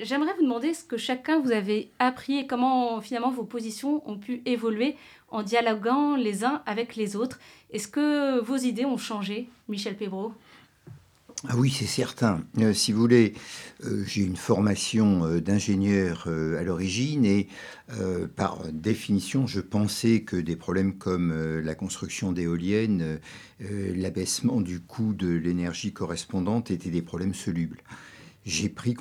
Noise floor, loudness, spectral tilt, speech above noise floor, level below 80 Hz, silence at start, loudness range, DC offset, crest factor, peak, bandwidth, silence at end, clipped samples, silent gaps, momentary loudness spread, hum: -50 dBFS; -27 LUFS; -5.5 dB/octave; 24 dB; -56 dBFS; 0 s; 5 LU; under 0.1%; 20 dB; -6 dBFS; 15.5 kHz; 0 s; under 0.1%; none; 10 LU; none